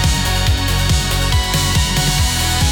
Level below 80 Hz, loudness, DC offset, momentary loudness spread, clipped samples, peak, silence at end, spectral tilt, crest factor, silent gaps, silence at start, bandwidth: -20 dBFS; -15 LUFS; under 0.1%; 1 LU; under 0.1%; -4 dBFS; 0 s; -3.5 dB/octave; 12 dB; none; 0 s; 19 kHz